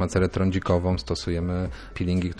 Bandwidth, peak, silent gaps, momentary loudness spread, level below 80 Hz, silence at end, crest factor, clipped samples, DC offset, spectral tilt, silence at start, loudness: 10 kHz; -8 dBFS; none; 7 LU; -38 dBFS; 0 s; 16 dB; under 0.1%; under 0.1%; -7 dB/octave; 0 s; -26 LUFS